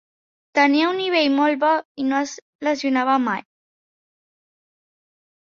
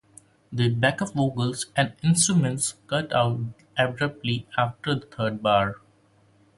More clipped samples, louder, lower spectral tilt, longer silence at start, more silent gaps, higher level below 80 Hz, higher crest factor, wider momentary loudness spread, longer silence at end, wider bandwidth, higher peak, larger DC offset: neither; first, -20 LUFS vs -25 LUFS; about the same, -3.5 dB/octave vs -4.5 dB/octave; about the same, 0.55 s vs 0.5 s; first, 1.85-1.95 s, 2.42-2.59 s vs none; second, -72 dBFS vs -56 dBFS; about the same, 20 dB vs 20 dB; about the same, 8 LU vs 8 LU; first, 2.2 s vs 0.8 s; second, 7.4 kHz vs 11.5 kHz; first, -2 dBFS vs -6 dBFS; neither